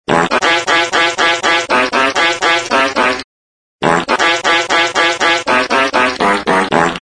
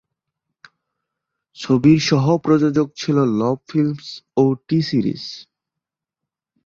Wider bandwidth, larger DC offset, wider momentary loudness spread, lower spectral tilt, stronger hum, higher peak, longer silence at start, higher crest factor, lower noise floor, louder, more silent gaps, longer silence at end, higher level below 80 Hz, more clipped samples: first, 10.5 kHz vs 7.6 kHz; neither; second, 3 LU vs 16 LU; second, -2.5 dB/octave vs -7 dB/octave; neither; about the same, 0 dBFS vs -2 dBFS; second, 0.1 s vs 1.6 s; about the same, 14 dB vs 18 dB; first, under -90 dBFS vs -85 dBFS; first, -12 LUFS vs -18 LUFS; first, 3.24-3.79 s vs none; second, 0 s vs 1.25 s; first, -48 dBFS vs -56 dBFS; neither